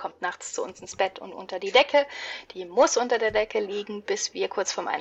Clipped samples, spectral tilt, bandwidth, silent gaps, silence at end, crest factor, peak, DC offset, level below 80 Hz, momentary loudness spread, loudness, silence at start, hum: under 0.1%; -1.5 dB/octave; 8.4 kHz; none; 0 s; 20 dB; -6 dBFS; under 0.1%; -62 dBFS; 14 LU; -26 LUFS; 0 s; none